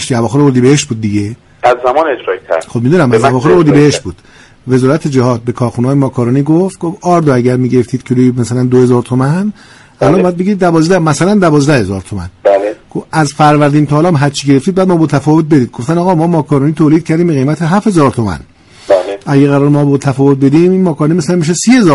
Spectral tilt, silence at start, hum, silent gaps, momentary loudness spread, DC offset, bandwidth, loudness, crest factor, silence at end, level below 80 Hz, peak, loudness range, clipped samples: -6.5 dB/octave; 0 s; none; none; 8 LU; under 0.1%; 11.5 kHz; -10 LUFS; 10 dB; 0 s; -42 dBFS; 0 dBFS; 1 LU; under 0.1%